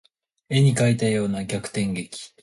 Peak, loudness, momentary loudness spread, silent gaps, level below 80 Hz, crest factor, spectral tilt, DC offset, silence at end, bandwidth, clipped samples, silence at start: -8 dBFS; -23 LUFS; 10 LU; none; -56 dBFS; 16 dB; -6 dB/octave; under 0.1%; 0.15 s; 11.5 kHz; under 0.1%; 0.5 s